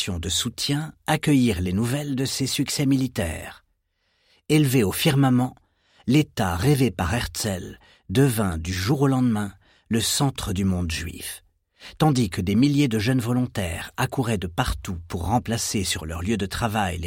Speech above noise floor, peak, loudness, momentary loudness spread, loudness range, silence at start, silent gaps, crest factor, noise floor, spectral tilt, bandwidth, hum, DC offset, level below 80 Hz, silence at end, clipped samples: 48 dB; -6 dBFS; -23 LUFS; 10 LU; 3 LU; 0 s; none; 18 dB; -70 dBFS; -5 dB/octave; 16.5 kHz; none; under 0.1%; -42 dBFS; 0 s; under 0.1%